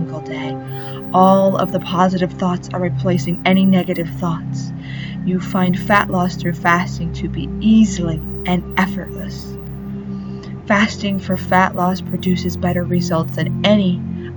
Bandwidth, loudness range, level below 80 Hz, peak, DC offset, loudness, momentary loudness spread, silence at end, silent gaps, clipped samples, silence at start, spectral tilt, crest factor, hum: over 20 kHz; 3 LU; -38 dBFS; 0 dBFS; under 0.1%; -18 LUFS; 14 LU; 0 s; none; under 0.1%; 0 s; -6.5 dB/octave; 18 dB; none